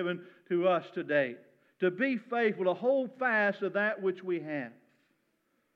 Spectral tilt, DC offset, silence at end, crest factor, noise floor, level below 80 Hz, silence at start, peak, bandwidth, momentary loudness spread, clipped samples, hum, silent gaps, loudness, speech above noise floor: -8 dB/octave; under 0.1%; 1.05 s; 16 dB; -76 dBFS; under -90 dBFS; 0 s; -16 dBFS; 6.2 kHz; 9 LU; under 0.1%; none; none; -31 LUFS; 45 dB